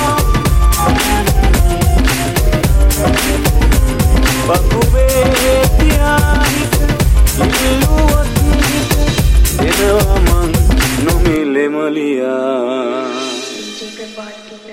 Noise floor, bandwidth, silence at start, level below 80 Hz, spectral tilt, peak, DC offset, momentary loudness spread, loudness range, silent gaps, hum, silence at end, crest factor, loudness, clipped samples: -31 dBFS; 16.5 kHz; 0 s; -14 dBFS; -5 dB/octave; 0 dBFS; under 0.1%; 7 LU; 3 LU; none; none; 0 s; 10 dB; -13 LUFS; under 0.1%